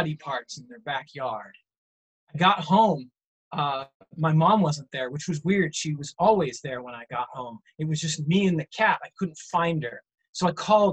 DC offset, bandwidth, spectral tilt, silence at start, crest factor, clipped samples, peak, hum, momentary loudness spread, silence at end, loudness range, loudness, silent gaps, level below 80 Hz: under 0.1%; 9 kHz; -5.5 dB/octave; 0 s; 18 dB; under 0.1%; -6 dBFS; none; 15 LU; 0 s; 3 LU; -25 LUFS; 1.78-2.27 s, 3.27-3.51 s, 3.94-4.00 s, 10.29-10.33 s; -64 dBFS